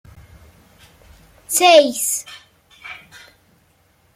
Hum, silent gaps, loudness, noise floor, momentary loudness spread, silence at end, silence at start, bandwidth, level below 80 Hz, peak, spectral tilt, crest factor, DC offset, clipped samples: none; none; -14 LUFS; -58 dBFS; 27 LU; 1.2 s; 1.5 s; 16.5 kHz; -56 dBFS; 0 dBFS; -1 dB/octave; 20 dB; under 0.1%; under 0.1%